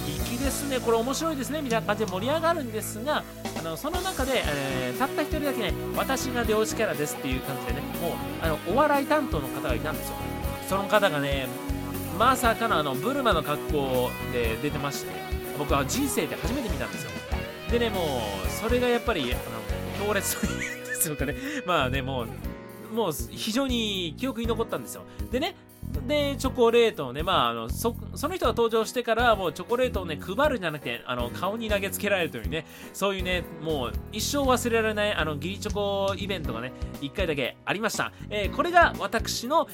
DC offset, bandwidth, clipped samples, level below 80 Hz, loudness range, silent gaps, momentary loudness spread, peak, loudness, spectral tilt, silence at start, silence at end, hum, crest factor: under 0.1%; 17 kHz; under 0.1%; -40 dBFS; 3 LU; none; 9 LU; -6 dBFS; -27 LUFS; -4.5 dB/octave; 0 s; 0 s; none; 22 dB